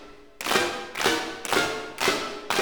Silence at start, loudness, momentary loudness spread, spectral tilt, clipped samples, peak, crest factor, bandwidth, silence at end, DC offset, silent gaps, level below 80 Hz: 0 s; -26 LUFS; 5 LU; -2 dB/octave; under 0.1%; -6 dBFS; 22 dB; over 20 kHz; 0 s; 0.3%; none; -58 dBFS